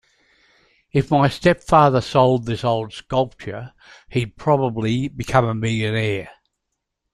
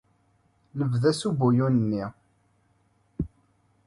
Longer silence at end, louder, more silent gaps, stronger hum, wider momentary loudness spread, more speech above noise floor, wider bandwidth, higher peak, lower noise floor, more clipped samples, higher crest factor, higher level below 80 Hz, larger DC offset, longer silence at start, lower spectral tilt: first, 0.85 s vs 0.6 s; first, -20 LUFS vs -26 LUFS; neither; neither; second, 11 LU vs 16 LU; first, 59 dB vs 43 dB; about the same, 12.5 kHz vs 11.5 kHz; first, -2 dBFS vs -10 dBFS; first, -78 dBFS vs -66 dBFS; neither; about the same, 18 dB vs 18 dB; first, -46 dBFS vs -52 dBFS; neither; first, 0.95 s vs 0.75 s; about the same, -6.5 dB/octave vs -7.5 dB/octave